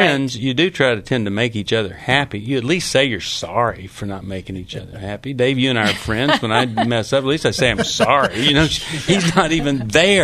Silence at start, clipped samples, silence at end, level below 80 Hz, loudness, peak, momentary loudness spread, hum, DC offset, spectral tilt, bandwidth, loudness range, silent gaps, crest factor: 0 s; under 0.1%; 0 s; -40 dBFS; -17 LUFS; 0 dBFS; 14 LU; none; under 0.1%; -4.5 dB/octave; 13.5 kHz; 4 LU; none; 18 dB